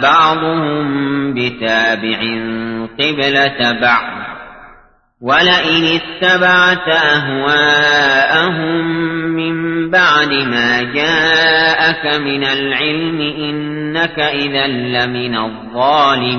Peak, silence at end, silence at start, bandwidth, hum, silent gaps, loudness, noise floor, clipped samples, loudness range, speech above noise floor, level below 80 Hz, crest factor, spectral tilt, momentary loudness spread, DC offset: 0 dBFS; 0 s; 0 s; 6.6 kHz; none; none; -13 LUFS; -46 dBFS; under 0.1%; 5 LU; 32 dB; -48 dBFS; 14 dB; -4.5 dB/octave; 9 LU; under 0.1%